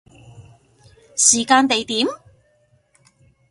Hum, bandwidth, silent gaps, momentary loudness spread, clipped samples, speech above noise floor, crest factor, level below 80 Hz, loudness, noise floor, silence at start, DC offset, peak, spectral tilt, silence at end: none; 11.5 kHz; none; 14 LU; under 0.1%; 43 dB; 22 dB; -60 dBFS; -16 LUFS; -60 dBFS; 0.4 s; under 0.1%; 0 dBFS; -1 dB/octave; 1.35 s